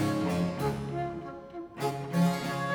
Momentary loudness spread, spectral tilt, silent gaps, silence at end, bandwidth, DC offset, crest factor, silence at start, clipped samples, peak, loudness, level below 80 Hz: 14 LU; -6.5 dB/octave; none; 0 s; 18.5 kHz; under 0.1%; 16 dB; 0 s; under 0.1%; -16 dBFS; -31 LUFS; -56 dBFS